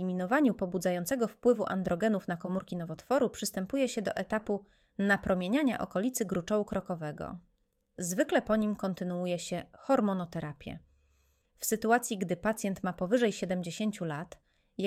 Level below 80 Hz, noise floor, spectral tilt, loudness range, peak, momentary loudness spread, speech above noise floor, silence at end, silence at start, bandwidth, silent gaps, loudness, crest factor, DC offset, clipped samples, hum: -60 dBFS; -70 dBFS; -5 dB/octave; 2 LU; -12 dBFS; 11 LU; 39 dB; 0 s; 0 s; 16 kHz; none; -32 LUFS; 20 dB; under 0.1%; under 0.1%; none